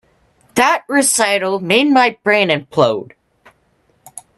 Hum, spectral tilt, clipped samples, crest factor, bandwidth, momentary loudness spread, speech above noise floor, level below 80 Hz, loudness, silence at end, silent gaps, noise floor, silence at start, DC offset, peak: none; -3 dB/octave; under 0.1%; 16 dB; 13.5 kHz; 5 LU; 45 dB; -60 dBFS; -14 LUFS; 0.2 s; none; -59 dBFS; 0.55 s; under 0.1%; 0 dBFS